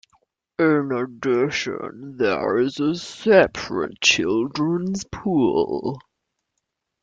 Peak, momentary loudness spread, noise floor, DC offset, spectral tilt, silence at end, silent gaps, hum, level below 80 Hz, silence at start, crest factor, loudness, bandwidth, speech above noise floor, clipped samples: -2 dBFS; 11 LU; -78 dBFS; under 0.1%; -4.5 dB/octave; 1.05 s; none; none; -56 dBFS; 0.6 s; 20 dB; -21 LUFS; 9.2 kHz; 57 dB; under 0.1%